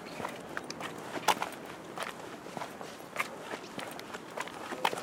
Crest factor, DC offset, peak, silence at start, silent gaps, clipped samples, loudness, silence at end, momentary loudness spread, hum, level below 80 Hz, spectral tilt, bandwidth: 28 dB; under 0.1%; -12 dBFS; 0 s; none; under 0.1%; -38 LUFS; 0 s; 11 LU; none; -74 dBFS; -2.5 dB/octave; 17.5 kHz